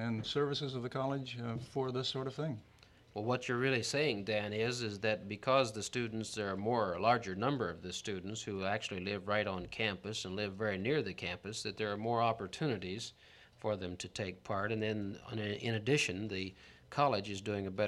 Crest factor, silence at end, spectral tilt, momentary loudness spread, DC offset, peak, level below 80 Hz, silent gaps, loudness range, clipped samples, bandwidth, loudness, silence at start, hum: 22 dB; 0 s; -5 dB/octave; 9 LU; under 0.1%; -16 dBFS; -68 dBFS; none; 4 LU; under 0.1%; 13 kHz; -37 LUFS; 0 s; none